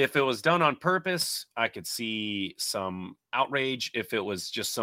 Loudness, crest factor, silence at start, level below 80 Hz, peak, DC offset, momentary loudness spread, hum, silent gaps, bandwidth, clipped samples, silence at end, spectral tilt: -28 LUFS; 20 dB; 0 s; -72 dBFS; -8 dBFS; under 0.1%; 8 LU; none; none; 16.5 kHz; under 0.1%; 0 s; -3.5 dB/octave